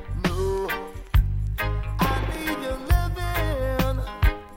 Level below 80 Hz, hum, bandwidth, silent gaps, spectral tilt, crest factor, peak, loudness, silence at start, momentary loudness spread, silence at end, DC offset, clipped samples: -26 dBFS; none; 16.5 kHz; none; -6 dB/octave; 16 dB; -8 dBFS; -26 LUFS; 0 s; 4 LU; 0 s; under 0.1%; under 0.1%